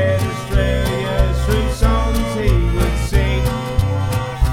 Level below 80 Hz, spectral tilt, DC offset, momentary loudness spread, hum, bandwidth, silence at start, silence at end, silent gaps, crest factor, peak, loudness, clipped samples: -20 dBFS; -6 dB/octave; 0.3%; 3 LU; none; 16 kHz; 0 s; 0 s; none; 14 dB; -2 dBFS; -18 LUFS; under 0.1%